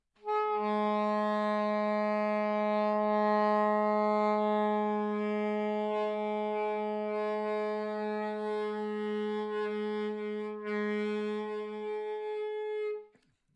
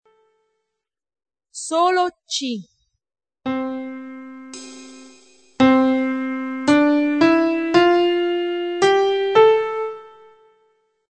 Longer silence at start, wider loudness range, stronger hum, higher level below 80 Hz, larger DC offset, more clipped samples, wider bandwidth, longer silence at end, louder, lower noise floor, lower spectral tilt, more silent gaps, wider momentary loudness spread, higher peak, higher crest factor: second, 0.25 s vs 1.55 s; second, 6 LU vs 9 LU; neither; second, -82 dBFS vs -62 dBFS; neither; neither; about the same, 8.4 kHz vs 9.2 kHz; second, 0.5 s vs 1.05 s; second, -32 LUFS vs -18 LUFS; second, -66 dBFS vs -82 dBFS; first, -7.5 dB/octave vs -4 dB/octave; neither; second, 8 LU vs 21 LU; second, -18 dBFS vs -2 dBFS; about the same, 14 dB vs 18 dB